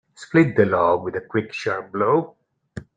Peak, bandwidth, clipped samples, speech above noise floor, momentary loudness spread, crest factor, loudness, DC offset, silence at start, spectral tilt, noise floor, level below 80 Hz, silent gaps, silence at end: -4 dBFS; 9.2 kHz; under 0.1%; 20 dB; 15 LU; 18 dB; -21 LUFS; under 0.1%; 0.2 s; -7.5 dB/octave; -40 dBFS; -58 dBFS; none; 0.15 s